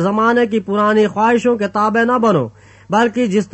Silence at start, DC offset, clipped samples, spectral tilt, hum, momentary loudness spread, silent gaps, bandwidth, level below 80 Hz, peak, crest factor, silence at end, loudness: 0 s; under 0.1%; under 0.1%; -6.5 dB/octave; none; 4 LU; none; 8.4 kHz; -56 dBFS; -2 dBFS; 12 dB; 0.05 s; -15 LUFS